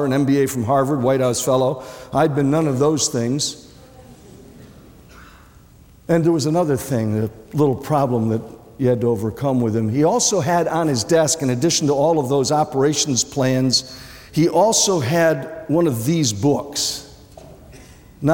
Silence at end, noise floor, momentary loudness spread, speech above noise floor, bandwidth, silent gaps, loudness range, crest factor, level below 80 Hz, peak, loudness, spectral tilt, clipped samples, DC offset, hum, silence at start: 0 s; -47 dBFS; 7 LU; 29 dB; 17 kHz; none; 5 LU; 14 dB; -52 dBFS; -4 dBFS; -18 LUFS; -4.5 dB/octave; under 0.1%; under 0.1%; none; 0 s